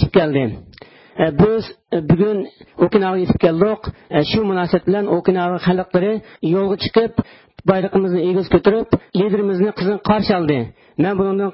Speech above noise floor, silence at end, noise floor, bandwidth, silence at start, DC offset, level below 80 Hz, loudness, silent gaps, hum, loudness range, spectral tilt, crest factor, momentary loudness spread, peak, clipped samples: 26 dB; 0 s; -42 dBFS; 5.8 kHz; 0 s; under 0.1%; -40 dBFS; -17 LUFS; none; none; 1 LU; -12 dB/octave; 16 dB; 8 LU; -2 dBFS; under 0.1%